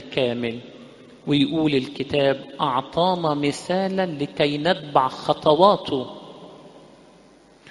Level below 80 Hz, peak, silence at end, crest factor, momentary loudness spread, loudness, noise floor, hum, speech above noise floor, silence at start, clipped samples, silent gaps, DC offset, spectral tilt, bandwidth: -58 dBFS; 0 dBFS; 0.9 s; 22 dB; 18 LU; -22 LUFS; -52 dBFS; none; 30 dB; 0 s; under 0.1%; none; under 0.1%; -6 dB/octave; 11.5 kHz